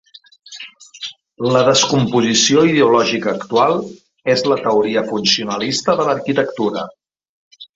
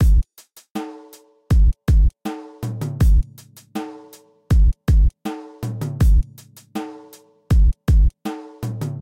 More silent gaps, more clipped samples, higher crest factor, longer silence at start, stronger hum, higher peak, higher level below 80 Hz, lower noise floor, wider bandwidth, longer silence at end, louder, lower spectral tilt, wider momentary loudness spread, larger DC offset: first, 7.29-7.51 s vs 0.71-0.75 s; neither; first, 16 dB vs 10 dB; first, 0.5 s vs 0 s; neither; first, 0 dBFS vs -8 dBFS; second, -58 dBFS vs -20 dBFS; second, -37 dBFS vs -50 dBFS; second, 8 kHz vs 14 kHz; about the same, 0.1 s vs 0 s; first, -15 LUFS vs -21 LUFS; second, -3.5 dB/octave vs -7.5 dB/octave; about the same, 18 LU vs 16 LU; neither